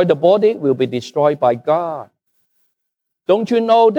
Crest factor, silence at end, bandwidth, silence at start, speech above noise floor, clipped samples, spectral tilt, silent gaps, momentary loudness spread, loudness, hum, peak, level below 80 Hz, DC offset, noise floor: 14 dB; 0 s; 8.6 kHz; 0 s; 62 dB; under 0.1%; -7 dB/octave; none; 9 LU; -16 LUFS; none; -2 dBFS; -70 dBFS; under 0.1%; -77 dBFS